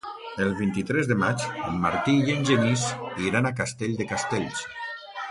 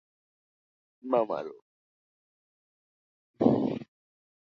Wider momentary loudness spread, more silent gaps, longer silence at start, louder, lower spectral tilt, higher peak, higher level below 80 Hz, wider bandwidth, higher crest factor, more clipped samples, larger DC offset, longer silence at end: second, 11 LU vs 16 LU; second, none vs 1.62-3.34 s; second, 0.05 s vs 1.05 s; first, -26 LUFS vs -29 LUFS; second, -5 dB/octave vs -9.5 dB/octave; about the same, -8 dBFS vs -6 dBFS; first, -54 dBFS vs -70 dBFS; first, 11.5 kHz vs 6.2 kHz; second, 18 dB vs 28 dB; neither; neither; second, 0 s vs 0.75 s